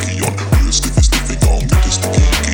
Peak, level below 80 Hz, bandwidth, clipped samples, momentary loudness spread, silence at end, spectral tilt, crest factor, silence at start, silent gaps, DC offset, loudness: 0 dBFS; -16 dBFS; 19.5 kHz; under 0.1%; 2 LU; 0 s; -4 dB/octave; 12 dB; 0 s; none; under 0.1%; -14 LUFS